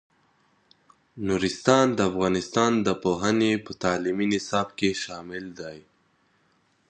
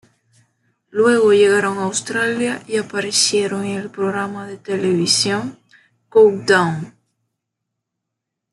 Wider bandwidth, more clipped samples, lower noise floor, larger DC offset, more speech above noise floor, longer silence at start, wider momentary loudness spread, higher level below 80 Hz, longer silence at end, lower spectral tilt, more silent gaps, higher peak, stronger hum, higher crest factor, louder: second, 9.8 kHz vs 12 kHz; neither; second, -66 dBFS vs -80 dBFS; neither; second, 42 dB vs 63 dB; first, 1.15 s vs 0.95 s; about the same, 15 LU vs 13 LU; first, -56 dBFS vs -66 dBFS; second, 1.1 s vs 1.65 s; first, -5 dB/octave vs -3.5 dB/octave; neither; about the same, -2 dBFS vs -2 dBFS; neither; first, 24 dB vs 16 dB; second, -25 LUFS vs -17 LUFS